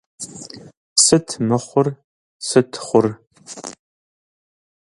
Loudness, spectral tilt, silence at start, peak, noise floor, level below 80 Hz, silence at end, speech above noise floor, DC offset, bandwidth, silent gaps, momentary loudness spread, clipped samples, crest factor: -17 LUFS; -4 dB/octave; 0.2 s; 0 dBFS; -38 dBFS; -58 dBFS; 1.15 s; 20 dB; under 0.1%; 11.5 kHz; 0.77-0.96 s, 2.04-2.40 s; 22 LU; under 0.1%; 20 dB